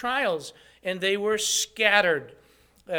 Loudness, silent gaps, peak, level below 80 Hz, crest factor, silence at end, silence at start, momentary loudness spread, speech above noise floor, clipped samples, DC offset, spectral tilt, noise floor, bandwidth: -24 LUFS; none; -4 dBFS; -64 dBFS; 22 dB; 0 s; 0 s; 13 LU; 27 dB; under 0.1%; under 0.1%; -1.5 dB/octave; -52 dBFS; 19 kHz